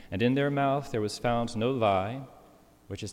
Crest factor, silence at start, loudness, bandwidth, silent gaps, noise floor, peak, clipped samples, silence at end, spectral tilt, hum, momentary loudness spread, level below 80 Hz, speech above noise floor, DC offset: 16 dB; 0 s; -28 LUFS; 16 kHz; none; -57 dBFS; -14 dBFS; under 0.1%; 0 s; -6 dB/octave; none; 15 LU; -54 dBFS; 29 dB; under 0.1%